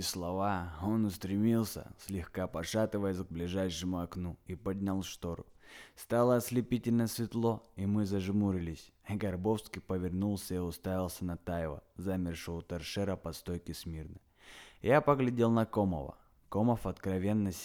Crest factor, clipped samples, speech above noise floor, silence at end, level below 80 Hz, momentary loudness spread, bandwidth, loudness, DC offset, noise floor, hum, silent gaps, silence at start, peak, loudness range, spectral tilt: 20 dB; under 0.1%; 22 dB; 0 s; -56 dBFS; 13 LU; 19.5 kHz; -34 LUFS; under 0.1%; -56 dBFS; none; none; 0 s; -12 dBFS; 6 LU; -6.5 dB/octave